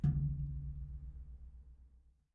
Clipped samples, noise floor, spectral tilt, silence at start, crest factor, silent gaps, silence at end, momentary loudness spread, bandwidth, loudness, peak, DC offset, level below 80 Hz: under 0.1%; -65 dBFS; -12 dB/octave; 0 s; 18 dB; none; 0.35 s; 21 LU; 1.9 kHz; -42 LUFS; -22 dBFS; under 0.1%; -46 dBFS